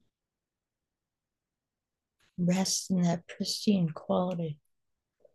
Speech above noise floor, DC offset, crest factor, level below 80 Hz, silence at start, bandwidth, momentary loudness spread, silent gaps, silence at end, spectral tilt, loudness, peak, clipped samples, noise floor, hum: 60 dB; under 0.1%; 20 dB; -74 dBFS; 2.4 s; 12.5 kHz; 10 LU; none; 0.8 s; -5 dB/octave; -30 LUFS; -14 dBFS; under 0.1%; -90 dBFS; none